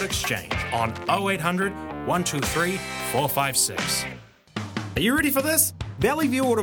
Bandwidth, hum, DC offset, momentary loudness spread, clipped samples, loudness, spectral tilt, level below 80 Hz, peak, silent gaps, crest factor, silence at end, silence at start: 19.5 kHz; none; under 0.1%; 11 LU; under 0.1%; -24 LUFS; -3.5 dB/octave; -46 dBFS; -4 dBFS; none; 20 dB; 0 s; 0 s